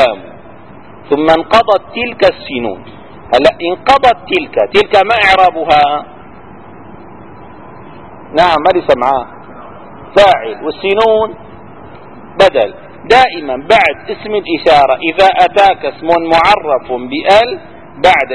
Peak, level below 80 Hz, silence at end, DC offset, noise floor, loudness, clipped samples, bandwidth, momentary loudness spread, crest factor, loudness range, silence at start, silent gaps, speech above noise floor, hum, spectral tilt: 0 dBFS; -40 dBFS; 0 s; 1%; -35 dBFS; -10 LUFS; 1%; 11 kHz; 11 LU; 12 dB; 5 LU; 0 s; none; 25 dB; none; -4.5 dB/octave